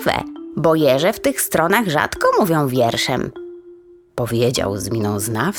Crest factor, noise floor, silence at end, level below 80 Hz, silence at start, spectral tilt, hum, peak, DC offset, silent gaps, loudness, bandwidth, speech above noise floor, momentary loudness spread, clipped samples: 18 dB; -44 dBFS; 0 s; -48 dBFS; 0 s; -4.5 dB/octave; none; 0 dBFS; under 0.1%; none; -18 LUFS; 19.5 kHz; 27 dB; 11 LU; under 0.1%